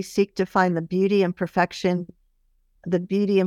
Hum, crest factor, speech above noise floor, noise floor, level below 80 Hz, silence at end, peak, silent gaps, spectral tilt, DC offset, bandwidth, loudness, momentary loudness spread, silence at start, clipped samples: none; 16 dB; 42 dB; -64 dBFS; -60 dBFS; 0 s; -6 dBFS; none; -6.5 dB/octave; under 0.1%; 13.5 kHz; -23 LUFS; 7 LU; 0 s; under 0.1%